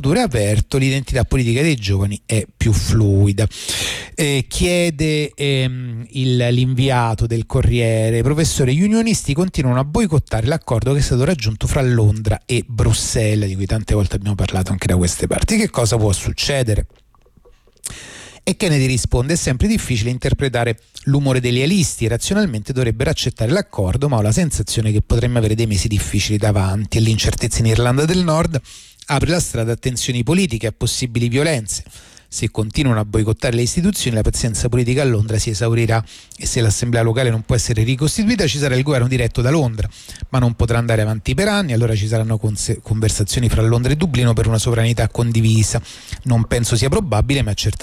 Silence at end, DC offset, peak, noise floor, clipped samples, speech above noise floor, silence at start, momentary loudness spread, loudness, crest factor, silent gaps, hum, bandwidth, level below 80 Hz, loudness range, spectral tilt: 0 s; under 0.1%; -6 dBFS; -50 dBFS; under 0.1%; 33 dB; 0 s; 5 LU; -17 LUFS; 12 dB; none; none; 15 kHz; -30 dBFS; 2 LU; -5.5 dB/octave